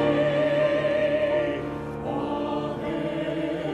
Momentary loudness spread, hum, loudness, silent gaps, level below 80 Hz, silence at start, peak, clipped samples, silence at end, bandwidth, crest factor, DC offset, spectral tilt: 8 LU; none; -26 LUFS; none; -52 dBFS; 0 s; -12 dBFS; under 0.1%; 0 s; 9.4 kHz; 14 dB; under 0.1%; -7 dB/octave